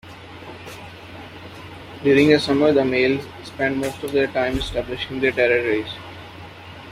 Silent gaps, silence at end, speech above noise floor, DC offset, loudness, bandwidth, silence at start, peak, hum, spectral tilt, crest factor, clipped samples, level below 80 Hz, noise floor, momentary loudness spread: none; 0 s; 19 dB; under 0.1%; -20 LUFS; 15 kHz; 0.05 s; -2 dBFS; none; -5.5 dB/octave; 20 dB; under 0.1%; -44 dBFS; -39 dBFS; 22 LU